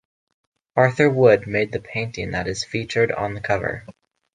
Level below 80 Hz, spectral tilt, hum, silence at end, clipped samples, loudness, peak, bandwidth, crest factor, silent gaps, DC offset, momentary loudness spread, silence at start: -48 dBFS; -6 dB/octave; none; 0.45 s; under 0.1%; -21 LUFS; -2 dBFS; 9.6 kHz; 20 dB; none; under 0.1%; 11 LU; 0.75 s